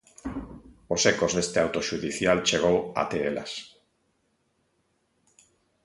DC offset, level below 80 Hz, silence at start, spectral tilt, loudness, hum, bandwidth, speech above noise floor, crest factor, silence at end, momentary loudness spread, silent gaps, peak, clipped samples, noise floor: under 0.1%; -54 dBFS; 0.25 s; -3.5 dB/octave; -25 LUFS; none; 11.5 kHz; 46 dB; 22 dB; 2.15 s; 15 LU; none; -6 dBFS; under 0.1%; -72 dBFS